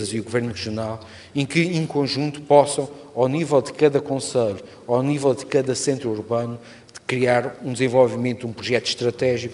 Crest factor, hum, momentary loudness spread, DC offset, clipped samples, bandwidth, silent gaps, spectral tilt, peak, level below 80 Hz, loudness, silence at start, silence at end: 20 dB; none; 11 LU; under 0.1%; under 0.1%; 11.5 kHz; none; -5 dB/octave; 0 dBFS; -60 dBFS; -22 LUFS; 0 s; 0 s